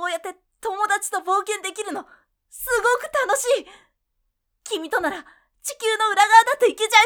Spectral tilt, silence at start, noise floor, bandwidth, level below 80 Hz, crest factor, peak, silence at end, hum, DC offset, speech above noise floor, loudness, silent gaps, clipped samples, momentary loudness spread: 0.5 dB/octave; 0 s; -74 dBFS; over 20 kHz; -60 dBFS; 22 dB; 0 dBFS; 0 s; none; under 0.1%; 54 dB; -21 LUFS; none; under 0.1%; 18 LU